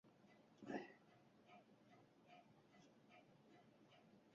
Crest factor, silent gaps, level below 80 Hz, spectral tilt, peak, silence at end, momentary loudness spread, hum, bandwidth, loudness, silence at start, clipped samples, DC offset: 26 dB; none; under -90 dBFS; -4.5 dB/octave; -36 dBFS; 0 s; 16 LU; none; 7.2 kHz; -59 LUFS; 0.05 s; under 0.1%; under 0.1%